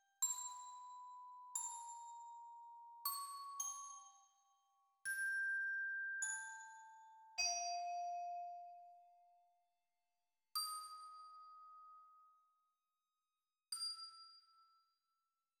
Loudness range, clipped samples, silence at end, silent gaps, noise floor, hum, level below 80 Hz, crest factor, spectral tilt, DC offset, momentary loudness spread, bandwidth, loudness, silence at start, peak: 10 LU; under 0.1%; 0.95 s; none; under -90 dBFS; none; under -90 dBFS; 22 dB; 4.5 dB/octave; under 0.1%; 20 LU; 17.5 kHz; -45 LUFS; 0.2 s; -28 dBFS